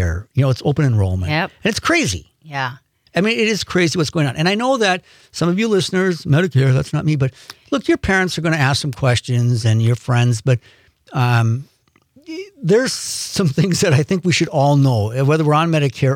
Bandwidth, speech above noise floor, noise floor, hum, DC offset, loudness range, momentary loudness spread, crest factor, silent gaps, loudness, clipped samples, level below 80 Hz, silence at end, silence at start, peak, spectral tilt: 15.5 kHz; 38 dB; -55 dBFS; none; under 0.1%; 3 LU; 9 LU; 12 dB; none; -17 LUFS; under 0.1%; -46 dBFS; 0 s; 0 s; -4 dBFS; -5.5 dB/octave